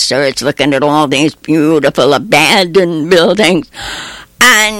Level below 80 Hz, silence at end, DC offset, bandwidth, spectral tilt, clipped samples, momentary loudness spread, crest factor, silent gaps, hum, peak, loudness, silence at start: -44 dBFS; 0 s; under 0.1%; 17 kHz; -3.5 dB/octave; under 0.1%; 13 LU; 10 dB; none; none; 0 dBFS; -9 LUFS; 0 s